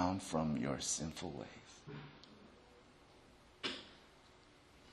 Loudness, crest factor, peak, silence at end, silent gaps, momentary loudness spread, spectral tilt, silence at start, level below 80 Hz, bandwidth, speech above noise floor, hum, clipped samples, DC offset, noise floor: -42 LUFS; 22 dB; -22 dBFS; 0 s; none; 25 LU; -4 dB/octave; 0 s; -66 dBFS; 12 kHz; 22 dB; none; under 0.1%; under 0.1%; -64 dBFS